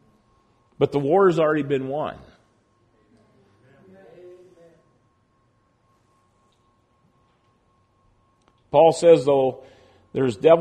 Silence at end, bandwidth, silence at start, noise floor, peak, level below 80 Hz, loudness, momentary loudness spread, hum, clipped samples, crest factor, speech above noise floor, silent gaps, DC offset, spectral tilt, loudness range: 0 s; 9.6 kHz; 0.8 s; -64 dBFS; -4 dBFS; -64 dBFS; -20 LUFS; 16 LU; none; under 0.1%; 20 dB; 46 dB; none; under 0.1%; -6.5 dB/octave; 12 LU